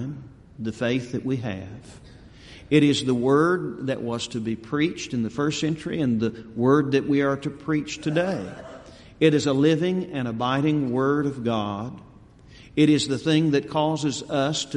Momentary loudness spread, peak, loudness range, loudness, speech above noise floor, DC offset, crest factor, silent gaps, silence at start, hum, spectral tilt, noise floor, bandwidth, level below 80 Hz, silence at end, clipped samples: 13 LU; -4 dBFS; 2 LU; -24 LUFS; 26 dB; under 0.1%; 20 dB; none; 0 s; none; -6 dB/octave; -49 dBFS; 10.5 kHz; -56 dBFS; 0 s; under 0.1%